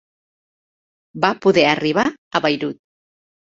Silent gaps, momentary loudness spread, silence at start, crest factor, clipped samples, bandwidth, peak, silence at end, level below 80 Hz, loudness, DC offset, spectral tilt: 2.18-2.31 s; 7 LU; 1.15 s; 20 dB; under 0.1%; 7.6 kHz; -2 dBFS; 0.8 s; -60 dBFS; -18 LUFS; under 0.1%; -5 dB/octave